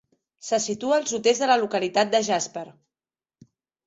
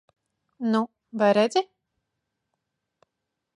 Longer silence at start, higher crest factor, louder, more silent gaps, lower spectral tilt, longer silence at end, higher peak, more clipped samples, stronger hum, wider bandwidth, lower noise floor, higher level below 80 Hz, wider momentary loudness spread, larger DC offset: second, 0.45 s vs 0.6 s; about the same, 18 dB vs 20 dB; about the same, -23 LUFS vs -24 LUFS; neither; second, -2.5 dB/octave vs -5.5 dB/octave; second, 1.15 s vs 1.9 s; about the same, -6 dBFS vs -8 dBFS; neither; neither; second, 8.2 kHz vs 11 kHz; first, under -90 dBFS vs -83 dBFS; first, -72 dBFS vs -82 dBFS; about the same, 14 LU vs 12 LU; neither